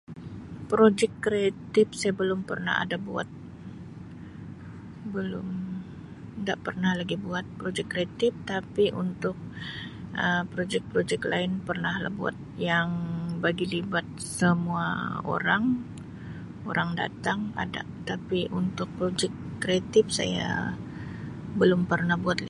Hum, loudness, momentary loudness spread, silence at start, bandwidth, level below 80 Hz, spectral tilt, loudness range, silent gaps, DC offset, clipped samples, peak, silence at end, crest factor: none; -28 LUFS; 17 LU; 0.1 s; 11.5 kHz; -54 dBFS; -5.5 dB/octave; 6 LU; none; under 0.1%; under 0.1%; -8 dBFS; 0 s; 20 dB